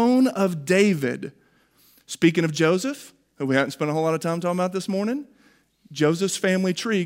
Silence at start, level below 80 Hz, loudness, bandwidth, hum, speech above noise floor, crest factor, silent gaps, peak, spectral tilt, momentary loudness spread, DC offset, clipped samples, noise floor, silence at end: 0 s; -72 dBFS; -23 LUFS; 16 kHz; none; 37 dB; 18 dB; none; -6 dBFS; -5.5 dB/octave; 12 LU; under 0.1%; under 0.1%; -60 dBFS; 0 s